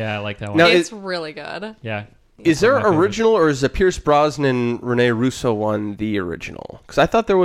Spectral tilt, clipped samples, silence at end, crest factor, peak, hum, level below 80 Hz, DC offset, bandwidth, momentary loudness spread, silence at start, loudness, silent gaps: -5.5 dB/octave; under 0.1%; 0 s; 16 dB; -2 dBFS; none; -42 dBFS; under 0.1%; 14 kHz; 14 LU; 0 s; -18 LUFS; none